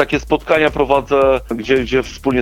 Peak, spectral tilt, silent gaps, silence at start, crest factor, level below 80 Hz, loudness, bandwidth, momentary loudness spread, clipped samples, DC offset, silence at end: 0 dBFS; -5.5 dB/octave; none; 0 s; 16 dB; -34 dBFS; -15 LUFS; 15.5 kHz; 5 LU; under 0.1%; under 0.1%; 0 s